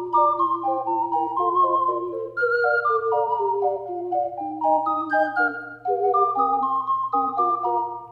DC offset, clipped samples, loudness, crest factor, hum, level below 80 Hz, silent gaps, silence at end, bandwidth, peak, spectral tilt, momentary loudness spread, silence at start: under 0.1%; under 0.1%; -22 LUFS; 14 dB; none; -70 dBFS; none; 0 s; 5.4 kHz; -8 dBFS; -7.5 dB/octave; 6 LU; 0 s